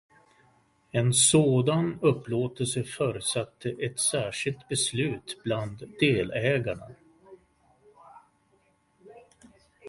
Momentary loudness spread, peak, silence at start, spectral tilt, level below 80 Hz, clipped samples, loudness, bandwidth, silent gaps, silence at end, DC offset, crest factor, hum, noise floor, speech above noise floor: 12 LU; -8 dBFS; 0.95 s; -4 dB/octave; -60 dBFS; under 0.1%; -26 LUFS; 11.5 kHz; none; 0 s; under 0.1%; 20 dB; none; -67 dBFS; 40 dB